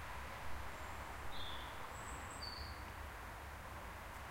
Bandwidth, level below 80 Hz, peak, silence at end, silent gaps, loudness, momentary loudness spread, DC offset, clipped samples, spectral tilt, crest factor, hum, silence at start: 16 kHz; -54 dBFS; -32 dBFS; 0 s; none; -49 LUFS; 4 LU; under 0.1%; under 0.1%; -3.5 dB/octave; 14 dB; none; 0 s